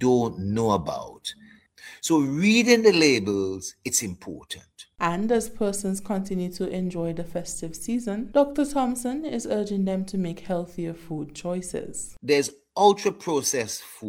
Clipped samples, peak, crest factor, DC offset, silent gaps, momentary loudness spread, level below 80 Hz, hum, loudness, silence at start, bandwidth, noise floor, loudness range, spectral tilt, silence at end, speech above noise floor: under 0.1%; -4 dBFS; 20 dB; under 0.1%; none; 14 LU; -52 dBFS; none; -25 LUFS; 0 s; 16.5 kHz; -48 dBFS; 6 LU; -4.5 dB/octave; 0 s; 24 dB